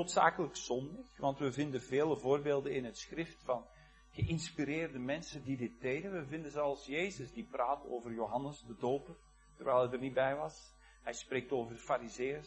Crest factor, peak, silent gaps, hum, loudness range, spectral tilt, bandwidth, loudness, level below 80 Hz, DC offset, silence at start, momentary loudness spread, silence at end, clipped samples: 24 dB; -12 dBFS; none; none; 3 LU; -5 dB/octave; 9.2 kHz; -38 LUFS; -62 dBFS; under 0.1%; 0 s; 10 LU; 0 s; under 0.1%